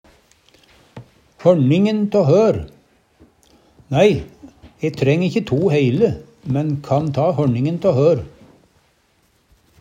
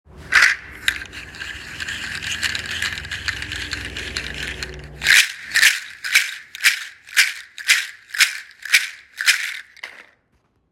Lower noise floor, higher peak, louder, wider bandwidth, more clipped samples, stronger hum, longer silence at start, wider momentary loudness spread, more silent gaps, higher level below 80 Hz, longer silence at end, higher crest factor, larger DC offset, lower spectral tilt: second, -60 dBFS vs -64 dBFS; about the same, 0 dBFS vs 0 dBFS; about the same, -17 LUFS vs -19 LUFS; second, 9.2 kHz vs 17 kHz; neither; neither; first, 0.95 s vs 0.15 s; second, 11 LU vs 17 LU; neither; about the same, -50 dBFS vs -46 dBFS; first, 1.5 s vs 0.7 s; about the same, 18 dB vs 22 dB; neither; first, -8 dB/octave vs 0.5 dB/octave